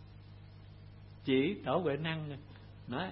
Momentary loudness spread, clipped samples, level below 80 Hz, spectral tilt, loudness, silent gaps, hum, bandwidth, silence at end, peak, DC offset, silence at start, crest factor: 23 LU; under 0.1%; -60 dBFS; -5 dB/octave; -35 LUFS; none; 50 Hz at -55 dBFS; 5.6 kHz; 0 s; -20 dBFS; under 0.1%; 0 s; 18 dB